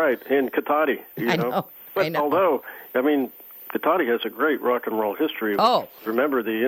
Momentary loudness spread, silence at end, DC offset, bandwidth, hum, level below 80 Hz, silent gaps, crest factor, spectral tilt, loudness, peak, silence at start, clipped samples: 7 LU; 0 s; under 0.1%; 18 kHz; none; -72 dBFS; none; 18 dB; -6 dB/octave; -23 LUFS; -6 dBFS; 0 s; under 0.1%